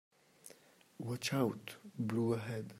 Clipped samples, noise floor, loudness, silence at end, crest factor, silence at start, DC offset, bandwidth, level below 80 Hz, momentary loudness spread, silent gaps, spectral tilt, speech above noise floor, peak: under 0.1%; -64 dBFS; -38 LUFS; 0 s; 18 dB; 0.45 s; under 0.1%; 16 kHz; -78 dBFS; 22 LU; none; -5.5 dB/octave; 26 dB; -22 dBFS